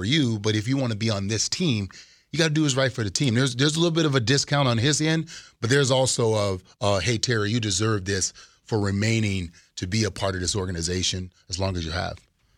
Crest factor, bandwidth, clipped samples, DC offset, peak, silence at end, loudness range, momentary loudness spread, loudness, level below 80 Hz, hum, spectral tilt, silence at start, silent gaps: 18 dB; 13.5 kHz; under 0.1%; under 0.1%; -6 dBFS; 0.4 s; 4 LU; 8 LU; -24 LUFS; -50 dBFS; none; -4.5 dB/octave; 0 s; none